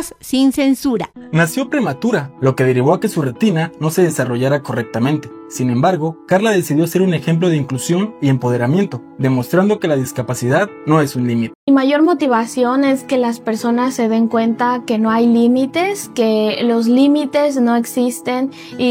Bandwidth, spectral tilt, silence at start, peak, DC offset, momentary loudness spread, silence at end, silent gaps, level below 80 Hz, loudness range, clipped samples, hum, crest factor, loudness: 17 kHz; -6 dB/octave; 0 s; 0 dBFS; under 0.1%; 6 LU; 0 s; 11.55-11.67 s; -58 dBFS; 2 LU; under 0.1%; none; 14 dB; -16 LUFS